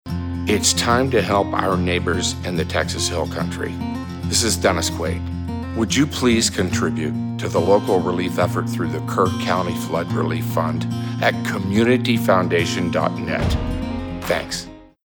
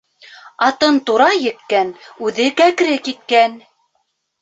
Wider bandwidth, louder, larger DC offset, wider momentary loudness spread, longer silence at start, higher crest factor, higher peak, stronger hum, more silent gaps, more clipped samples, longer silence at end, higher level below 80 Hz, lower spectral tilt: first, 19 kHz vs 8.2 kHz; second, -20 LUFS vs -15 LUFS; neither; about the same, 9 LU vs 8 LU; second, 0.05 s vs 0.45 s; about the same, 16 dB vs 16 dB; second, -4 dBFS vs 0 dBFS; neither; neither; neither; second, 0.2 s vs 0.85 s; first, -38 dBFS vs -66 dBFS; first, -4.5 dB/octave vs -3 dB/octave